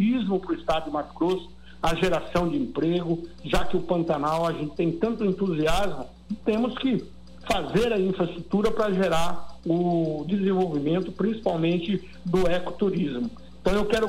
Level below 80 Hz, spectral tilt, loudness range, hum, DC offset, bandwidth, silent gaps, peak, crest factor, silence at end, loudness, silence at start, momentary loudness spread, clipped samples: -42 dBFS; -6.5 dB/octave; 2 LU; none; under 0.1%; 16 kHz; none; -10 dBFS; 14 dB; 0 s; -26 LUFS; 0 s; 7 LU; under 0.1%